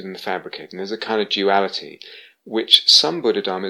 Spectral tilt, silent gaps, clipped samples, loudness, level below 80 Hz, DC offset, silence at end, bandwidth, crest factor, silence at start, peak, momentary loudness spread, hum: -2 dB/octave; none; under 0.1%; -16 LUFS; -76 dBFS; under 0.1%; 0 s; 19.5 kHz; 20 dB; 0 s; 0 dBFS; 19 LU; none